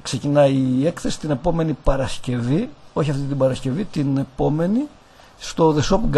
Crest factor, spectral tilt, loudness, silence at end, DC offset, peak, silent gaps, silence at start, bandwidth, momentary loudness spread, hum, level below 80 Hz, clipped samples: 18 dB; -6.5 dB/octave; -21 LUFS; 0 s; under 0.1%; -2 dBFS; none; 0.05 s; 12 kHz; 8 LU; none; -32 dBFS; under 0.1%